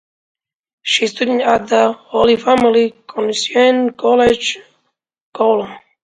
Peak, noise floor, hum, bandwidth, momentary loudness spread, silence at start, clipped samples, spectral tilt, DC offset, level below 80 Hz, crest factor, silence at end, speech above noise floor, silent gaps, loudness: 0 dBFS; -69 dBFS; none; 9.4 kHz; 8 LU; 0.85 s; under 0.1%; -3.5 dB/octave; under 0.1%; -50 dBFS; 16 dB; 0.25 s; 55 dB; 5.21-5.33 s; -14 LUFS